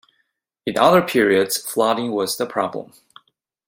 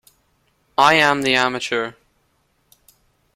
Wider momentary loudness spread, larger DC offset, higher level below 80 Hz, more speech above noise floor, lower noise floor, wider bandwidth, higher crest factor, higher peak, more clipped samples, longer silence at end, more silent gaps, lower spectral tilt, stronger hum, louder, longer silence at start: about the same, 11 LU vs 12 LU; neither; about the same, -62 dBFS vs -60 dBFS; first, 52 dB vs 48 dB; first, -71 dBFS vs -65 dBFS; about the same, 16.5 kHz vs 16.5 kHz; about the same, 20 dB vs 22 dB; about the same, -2 dBFS vs 0 dBFS; neither; second, 0.85 s vs 1.45 s; neither; about the same, -4 dB/octave vs -3 dB/octave; neither; about the same, -19 LUFS vs -17 LUFS; second, 0.65 s vs 0.8 s